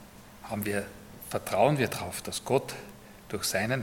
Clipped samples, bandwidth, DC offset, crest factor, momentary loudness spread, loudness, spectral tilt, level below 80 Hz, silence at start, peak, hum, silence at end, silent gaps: under 0.1%; 17.5 kHz; under 0.1%; 22 dB; 21 LU; -30 LUFS; -4.5 dB/octave; -58 dBFS; 0 s; -10 dBFS; none; 0 s; none